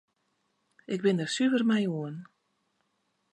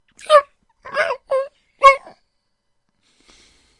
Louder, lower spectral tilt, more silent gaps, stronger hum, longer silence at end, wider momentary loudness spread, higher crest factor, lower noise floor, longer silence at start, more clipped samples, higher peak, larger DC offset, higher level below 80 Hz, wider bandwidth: second, -28 LUFS vs -16 LUFS; first, -5.5 dB/octave vs -0.5 dB/octave; neither; neither; second, 1.1 s vs 1.8 s; about the same, 13 LU vs 12 LU; about the same, 18 dB vs 20 dB; first, -76 dBFS vs -70 dBFS; first, 0.9 s vs 0.3 s; neither; second, -14 dBFS vs 0 dBFS; neither; second, -82 dBFS vs -54 dBFS; about the same, 11 kHz vs 11 kHz